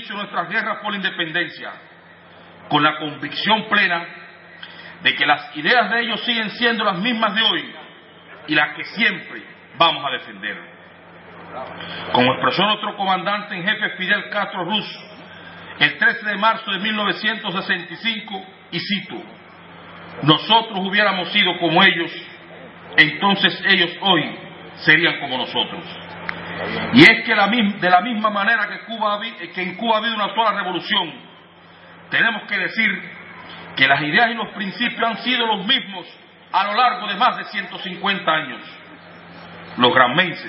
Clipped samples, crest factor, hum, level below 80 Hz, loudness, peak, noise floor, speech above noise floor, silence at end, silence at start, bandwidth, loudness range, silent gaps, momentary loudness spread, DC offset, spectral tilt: under 0.1%; 20 dB; none; -66 dBFS; -18 LUFS; 0 dBFS; -45 dBFS; 26 dB; 0 s; 0 s; 11 kHz; 6 LU; none; 20 LU; under 0.1%; -6 dB/octave